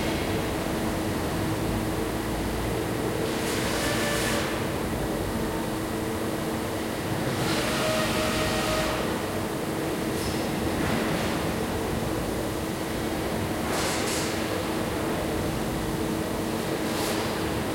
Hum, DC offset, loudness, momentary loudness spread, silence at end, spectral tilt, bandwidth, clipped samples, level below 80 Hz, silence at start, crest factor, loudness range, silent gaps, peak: none; under 0.1%; -28 LUFS; 4 LU; 0 s; -4.5 dB/octave; 16.5 kHz; under 0.1%; -42 dBFS; 0 s; 14 dB; 2 LU; none; -14 dBFS